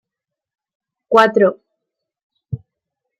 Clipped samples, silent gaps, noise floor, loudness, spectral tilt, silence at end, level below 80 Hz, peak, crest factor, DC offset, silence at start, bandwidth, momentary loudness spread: under 0.1%; 2.23-2.30 s; -84 dBFS; -14 LUFS; -6 dB/octave; 0.65 s; -58 dBFS; -2 dBFS; 20 dB; under 0.1%; 1.1 s; 13 kHz; 19 LU